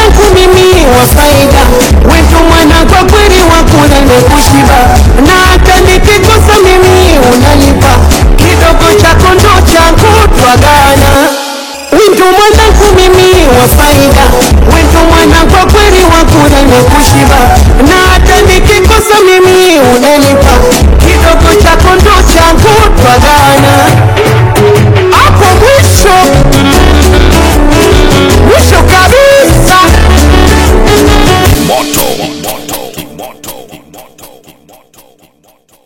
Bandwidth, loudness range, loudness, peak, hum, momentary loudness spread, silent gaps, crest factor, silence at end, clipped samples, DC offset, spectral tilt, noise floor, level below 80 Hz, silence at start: over 20 kHz; 2 LU; -3 LUFS; 0 dBFS; none; 3 LU; none; 4 dB; 1.6 s; 20%; under 0.1%; -4.5 dB/octave; -45 dBFS; -8 dBFS; 0 s